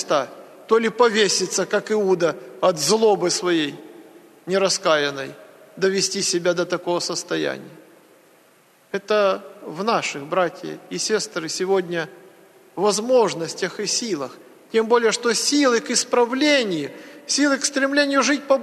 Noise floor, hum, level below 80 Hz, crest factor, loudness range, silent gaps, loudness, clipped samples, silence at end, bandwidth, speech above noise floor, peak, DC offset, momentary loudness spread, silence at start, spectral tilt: -55 dBFS; none; -76 dBFS; 18 dB; 6 LU; none; -20 LUFS; under 0.1%; 0 s; 13.5 kHz; 35 dB; -4 dBFS; under 0.1%; 11 LU; 0 s; -2.5 dB/octave